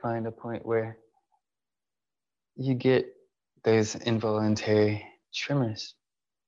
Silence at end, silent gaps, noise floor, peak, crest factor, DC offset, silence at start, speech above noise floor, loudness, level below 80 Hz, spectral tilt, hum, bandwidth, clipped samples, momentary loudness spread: 0.55 s; none; under -90 dBFS; -12 dBFS; 18 dB; under 0.1%; 0.05 s; over 63 dB; -28 LUFS; -72 dBFS; -6 dB/octave; none; 7.8 kHz; under 0.1%; 12 LU